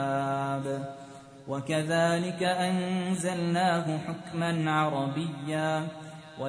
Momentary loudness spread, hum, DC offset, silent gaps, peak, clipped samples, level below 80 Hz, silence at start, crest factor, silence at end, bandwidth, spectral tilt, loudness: 13 LU; none; under 0.1%; none; -14 dBFS; under 0.1%; -68 dBFS; 0 s; 16 dB; 0 s; 10.5 kHz; -5.5 dB/octave; -29 LUFS